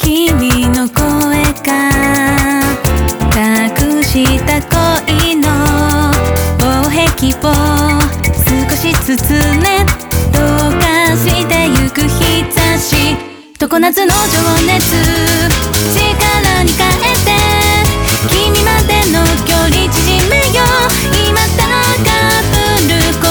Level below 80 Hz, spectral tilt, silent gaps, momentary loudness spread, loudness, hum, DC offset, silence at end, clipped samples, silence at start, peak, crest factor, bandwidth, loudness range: -20 dBFS; -4 dB/octave; none; 3 LU; -10 LUFS; none; under 0.1%; 0 s; under 0.1%; 0 s; 0 dBFS; 10 dB; over 20 kHz; 2 LU